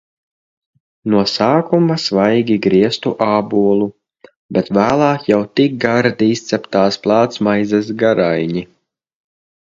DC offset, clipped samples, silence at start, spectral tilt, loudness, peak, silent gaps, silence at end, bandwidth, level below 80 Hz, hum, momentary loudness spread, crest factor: under 0.1%; under 0.1%; 1.05 s; -6 dB/octave; -15 LUFS; 0 dBFS; 4.36-4.49 s; 1 s; 7.8 kHz; -54 dBFS; none; 5 LU; 16 dB